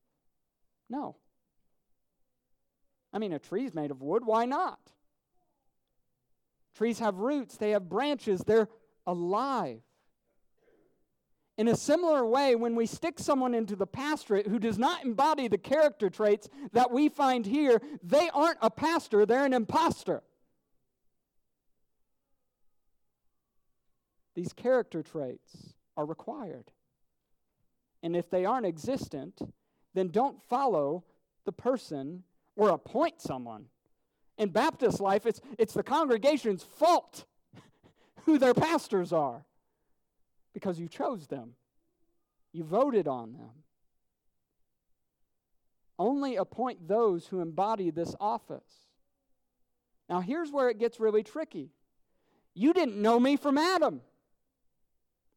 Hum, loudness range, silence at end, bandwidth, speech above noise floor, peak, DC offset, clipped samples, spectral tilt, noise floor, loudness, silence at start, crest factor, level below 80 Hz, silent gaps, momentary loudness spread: none; 10 LU; 1.35 s; 16.5 kHz; 49 dB; -14 dBFS; under 0.1%; under 0.1%; -5.5 dB/octave; -78 dBFS; -29 LUFS; 0.9 s; 18 dB; -72 dBFS; none; 15 LU